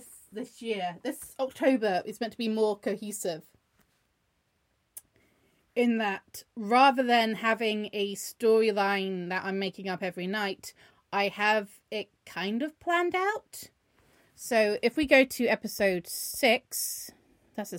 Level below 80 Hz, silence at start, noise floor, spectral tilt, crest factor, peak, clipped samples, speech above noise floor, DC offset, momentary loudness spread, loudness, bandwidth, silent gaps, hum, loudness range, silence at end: -66 dBFS; 0 s; -74 dBFS; -3.5 dB/octave; 22 dB; -8 dBFS; under 0.1%; 46 dB; under 0.1%; 18 LU; -28 LUFS; 16.5 kHz; none; none; 9 LU; 0 s